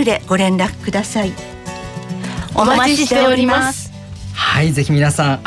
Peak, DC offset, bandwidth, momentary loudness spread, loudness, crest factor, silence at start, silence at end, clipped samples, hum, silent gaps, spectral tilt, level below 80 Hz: -4 dBFS; under 0.1%; 12 kHz; 16 LU; -15 LUFS; 12 dB; 0 s; 0 s; under 0.1%; none; none; -5 dB/octave; -40 dBFS